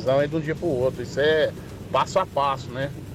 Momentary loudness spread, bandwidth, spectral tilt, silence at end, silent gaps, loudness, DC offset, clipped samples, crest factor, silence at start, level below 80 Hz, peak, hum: 8 LU; 15.5 kHz; -5.5 dB/octave; 0 s; none; -24 LUFS; under 0.1%; under 0.1%; 14 dB; 0 s; -48 dBFS; -10 dBFS; none